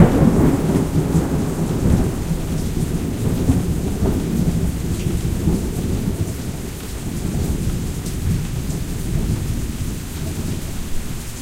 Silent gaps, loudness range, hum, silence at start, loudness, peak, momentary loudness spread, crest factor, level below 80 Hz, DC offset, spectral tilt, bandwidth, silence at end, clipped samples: none; 5 LU; none; 0 s; -21 LUFS; 0 dBFS; 9 LU; 20 dB; -26 dBFS; under 0.1%; -6.5 dB/octave; 16 kHz; 0 s; under 0.1%